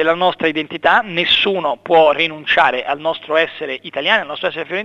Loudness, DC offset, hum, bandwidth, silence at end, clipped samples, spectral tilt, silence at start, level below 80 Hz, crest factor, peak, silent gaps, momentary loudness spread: -16 LUFS; under 0.1%; none; 7.8 kHz; 0 s; under 0.1%; -5 dB/octave; 0 s; -54 dBFS; 16 dB; 0 dBFS; none; 8 LU